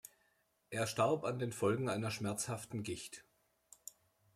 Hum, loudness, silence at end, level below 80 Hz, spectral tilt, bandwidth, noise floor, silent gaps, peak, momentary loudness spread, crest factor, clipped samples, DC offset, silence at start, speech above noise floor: none; -38 LUFS; 1.15 s; -74 dBFS; -5 dB/octave; 16 kHz; -77 dBFS; none; -22 dBFS; 19 LU; 18 dB; under 0.1%; under 0.1%; 0.05 s; 40 dB